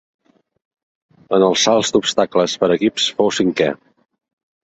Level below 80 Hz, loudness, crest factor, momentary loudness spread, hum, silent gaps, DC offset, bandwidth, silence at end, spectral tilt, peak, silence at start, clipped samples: -58 dBFS; -16 LUFS; 16 dB; 6 LU; none; none; under 0.1%; 8.2 kHz; 0.95 s; -3.5 dB/octave; -2 dBFS; 1.3 s; under 0.1%